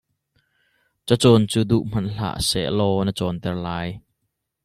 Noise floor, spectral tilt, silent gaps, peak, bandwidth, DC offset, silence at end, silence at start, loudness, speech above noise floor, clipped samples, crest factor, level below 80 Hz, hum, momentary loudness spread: -76 dBFS; -5.5 dB/octave; none; -2 dBFS; 14 kHz; under 0.1%; 0.65 s; 1.05 s; -21 LUFS; 56 dB; under 0.1%; 20 dB; -46 dBFS; none; 13 LU